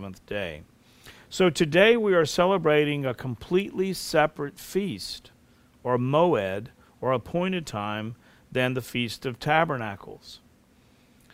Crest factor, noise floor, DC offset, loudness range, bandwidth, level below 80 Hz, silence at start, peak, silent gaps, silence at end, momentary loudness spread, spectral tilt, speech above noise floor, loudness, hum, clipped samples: 20 dB; -59 dBFS; under 0.1%; 6 LU; 16 kHz; -56 dBFS; 0 s; -6 dBFS; none; 1 s; 15 LU; -5.5 dB/octave; 34 dB; -25 LUFS; none; under 0.1%